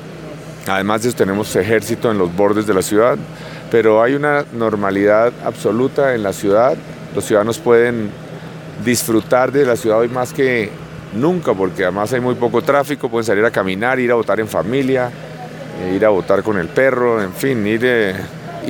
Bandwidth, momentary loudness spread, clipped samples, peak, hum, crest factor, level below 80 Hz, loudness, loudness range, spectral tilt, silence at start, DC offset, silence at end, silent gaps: 17.5 kHz; 13 LU; under 0.1%; 0 dBFS; none; 16 dB; -50 dBFS; -16 LUFS; 2 LU; -5.5 dB/octave; 0 s; under 0.1%; 0 s; none